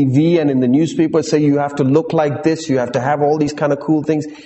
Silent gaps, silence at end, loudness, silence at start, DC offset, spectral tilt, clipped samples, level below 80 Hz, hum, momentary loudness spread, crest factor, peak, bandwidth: none; 0.05 s; -16 LUFS; 0 s; under 0.1%; -7 dB/octave; under 0.1%; -54 dBFS; none; 4 LU; 12 dB; -2 dBFS; 8.4 kHz